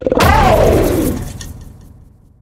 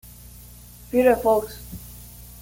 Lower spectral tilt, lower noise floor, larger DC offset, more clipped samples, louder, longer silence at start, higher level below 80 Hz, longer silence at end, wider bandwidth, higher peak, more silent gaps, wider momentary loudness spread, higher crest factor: about the same, -5.5 dB/octave vs -5.5 dB/octave; about the same, -42 dBFS vs -44 dBFS; neither; neither; first, -12 LUFS vs -20 LUFS; second, 0 s vs 0.9 s; first, -22 dBFS vs -46 dBFS; first, 0.75 s vs 0 s; about the same, 17.5 kHz vs 17 kHz; first, 0 dBFS vs -6 dBFS; neither; second, 19 LU vs 25 LU; about the same, 14 dB vs 18 dB